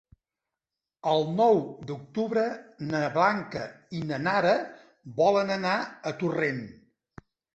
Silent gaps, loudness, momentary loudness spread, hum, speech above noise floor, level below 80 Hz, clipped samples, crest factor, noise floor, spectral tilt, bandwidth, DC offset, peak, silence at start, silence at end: none; -27 LUFS; 14 LU; none; 62 dB; -66 dBFS; under 0.1%; 20 dB; -89 dBFS; -6 dB/octave; 8.2 kHz; under 0.1%; -8 dBFS; 1.05 s; 0.85 s